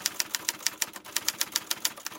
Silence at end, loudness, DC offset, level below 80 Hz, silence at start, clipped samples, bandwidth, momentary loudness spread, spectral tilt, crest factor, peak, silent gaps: 0 s; -29 LUFS; under 0.1%; -74 dBFS; 0 s; under 0.1%; 16.5 kHz; 2 LU; 1.5 dB/octave; 30 dB; -4 dBFS; none